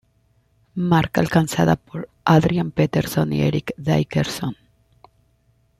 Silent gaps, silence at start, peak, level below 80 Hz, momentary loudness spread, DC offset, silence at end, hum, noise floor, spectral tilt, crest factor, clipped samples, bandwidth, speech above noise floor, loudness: none; 0.75 s; -2 dBFS; -48 dBFS; 10 LU; under 0.1%; 1.25 s; none; -62 dBFS; -6.5 dB/octave; 18 dB; under 0.1%; 15 kHz; 43 dB; -20 LUFS